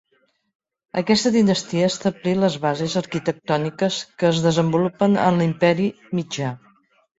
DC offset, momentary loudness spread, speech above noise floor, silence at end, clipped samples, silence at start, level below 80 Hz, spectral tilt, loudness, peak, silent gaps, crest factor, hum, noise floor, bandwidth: under 0.1%; 9 LU; 46 dB; 0.65 s; under 0.1%; 0.95 s; -58 dBFS; -5.5 dB/octave; -21 LUFS; -2 dBFS; none; 18 dB; none; -66 dBFS; 8 kHz